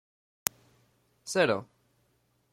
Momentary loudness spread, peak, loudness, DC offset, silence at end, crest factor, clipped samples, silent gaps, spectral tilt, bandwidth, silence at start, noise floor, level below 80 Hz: 8 LU; 0 dBFS; -30 LUFS; under 0.1%; 0.9 s; 34 dB; under 0.1%; none; -3 dB/octave; 16.5 kHz; 1.25 s; -72 dBFS; -72 dBFS